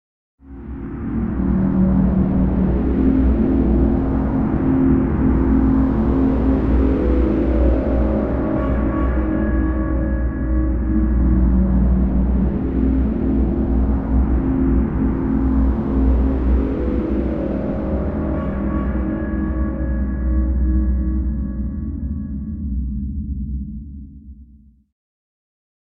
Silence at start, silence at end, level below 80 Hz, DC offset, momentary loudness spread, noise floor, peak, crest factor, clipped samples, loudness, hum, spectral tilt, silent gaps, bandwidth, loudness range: 0.45 s; 1.4 s; -22 dBFS; under 0.1%; 9 LU; -47 dBFS; -4 dBFS; 14 dB; under 0.1%; -19 LUFS; none; -12 dB/octave; none; 3.2 kHz; 6 LU